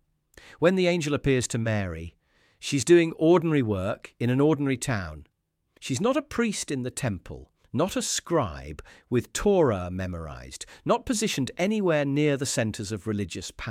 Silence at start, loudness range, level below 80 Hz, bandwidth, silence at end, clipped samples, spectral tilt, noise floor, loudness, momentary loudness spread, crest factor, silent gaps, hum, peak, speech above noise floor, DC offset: 0.45 s; 5 LU; -50 dBFS; 16 kHz; 0 s; under 0.1%; -5 dB/octave; -68 dBFS; -26 LUFS; 16 LU; 18 dB; none; none; -8 dBFS; 42 dB; under 0.1%